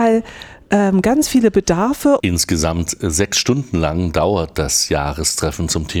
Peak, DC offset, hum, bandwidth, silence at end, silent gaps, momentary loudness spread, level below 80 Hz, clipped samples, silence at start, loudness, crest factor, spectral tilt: -2 dBFS; under 0.1%; none; 20 kHz; 0 s; none; 5 LU; -32 dBFS; under 0.1%; 0 s; -16 LUFS; 14 dB; -4.5 dB/octave